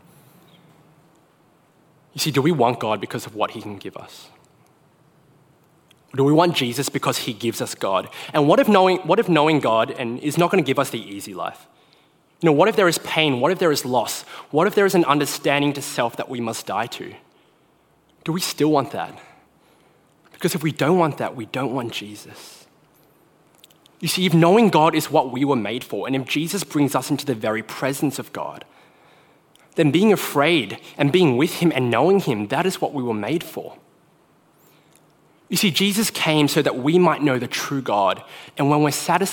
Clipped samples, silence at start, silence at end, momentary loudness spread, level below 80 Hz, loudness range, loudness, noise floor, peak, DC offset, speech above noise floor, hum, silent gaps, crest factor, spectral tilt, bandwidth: under 0.1%; 2.15 s; 0 s; 14 LU; -68 dBFS; 7 LU; -20 LUFS; -59 dBFS; 0 dBFS; under 0.1%; 39 dB; none; none; 20 dB; -5 dB/octave; 17.5 kHz